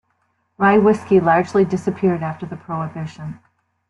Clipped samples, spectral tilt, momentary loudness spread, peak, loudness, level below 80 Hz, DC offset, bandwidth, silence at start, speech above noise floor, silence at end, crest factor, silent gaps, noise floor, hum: under 0.1%; -8 dB/octave; 16 LU; -4 dBFS; -18 LUFS; -58 dBFS; under 0.1%; 10.5 kHz; 0.6 s; 49 dB; 0.55 s; 16 dB; none; -67 dBFS; none